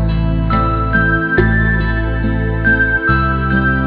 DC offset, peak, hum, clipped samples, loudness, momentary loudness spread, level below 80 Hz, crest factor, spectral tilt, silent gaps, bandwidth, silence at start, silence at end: under 0.1%; 0 dBFS; none; under 0.1%; -14 LUFS; 5 LU; -20 dBFS; 12 dB; -10.5 dB/octave; none; 5 kHz; 0 s; 0 s